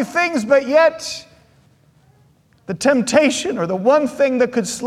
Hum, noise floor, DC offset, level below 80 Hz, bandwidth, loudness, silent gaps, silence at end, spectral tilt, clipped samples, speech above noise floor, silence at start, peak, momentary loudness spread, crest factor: none; -54 dBFS; under 0.1%; -58 dBFS; 14 kHz; -17 LUFS; none; 0 s; -4 dB/octave; under 0.1%; 38 dB; 0 s; -2 dBFS; 12 LU; 16 dB